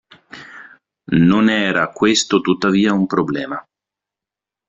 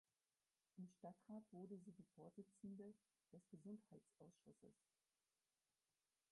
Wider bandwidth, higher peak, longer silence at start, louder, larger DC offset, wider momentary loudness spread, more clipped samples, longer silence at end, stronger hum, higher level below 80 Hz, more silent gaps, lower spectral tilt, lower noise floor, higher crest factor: second, 8.2 kHz vs 11 kHz; first, -2 dBFS vs -46 dBFS; second, 0.35 s vs 0.75 s; first, -16 LUFS vs -62 LUFS; neither; first, 21 LU vs 7 LU; neither; second, 1.1 s vs 1.6 s; neither; first, -54 dBFS vs under -90 dBFS; neither; second, -5 dB/octave vs -8 dB/octave; about the same, -87 dBFS vs under -90 dBFS; about the same, 16 dB vs 18 dB